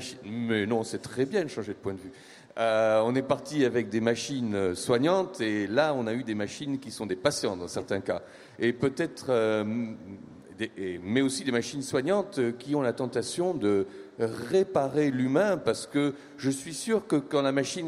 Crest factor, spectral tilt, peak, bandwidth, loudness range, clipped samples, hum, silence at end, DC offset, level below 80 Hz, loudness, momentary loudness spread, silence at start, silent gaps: 18 dB; -5 dB/octave; -10 dBFS; 14.5 kHz; 3 LU; under 0.1%; none; 0 s; under 0.1%; -66 dBFS; -29 LUFS; 10 LU; 0 s; none